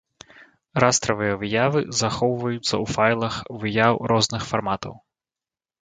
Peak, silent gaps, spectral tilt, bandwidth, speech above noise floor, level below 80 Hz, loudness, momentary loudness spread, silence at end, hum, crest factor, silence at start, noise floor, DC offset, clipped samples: 0 dBFS; none; -4 dB/octave; 9.6 kHz; over 68 dB; -52 dBFS; -22 LUFS; 9 LU; 0.85 s; none; 22 dB; 0.4 s; under -90 dBFS; under 0.1%; under 0.1%